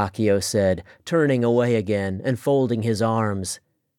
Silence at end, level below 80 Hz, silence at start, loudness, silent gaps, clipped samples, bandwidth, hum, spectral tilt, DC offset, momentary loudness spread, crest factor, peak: 0.4 s; -56 dBFS; 0 s; -22 LUFS; none; under 0.1%; 17 kHz; none; -6 dB/octave; under 0.1%; 8 LU; 16 dB; -6 dBFS